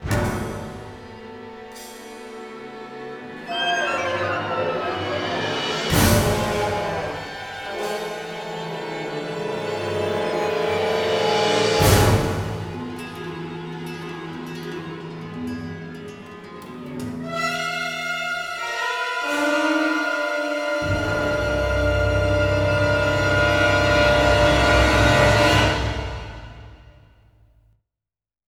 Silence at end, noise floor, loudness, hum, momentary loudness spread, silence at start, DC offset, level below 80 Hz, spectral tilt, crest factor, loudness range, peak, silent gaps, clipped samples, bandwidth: 1.55 s; under -90 dBFS; -21 LUFS; none; 20 LU; 0 s; under 0.1%; -34 dBFS; -4.5 dB/octave; 20 dB; 14 LU; -2 dBFS; none; under 0.1%; 20 kHz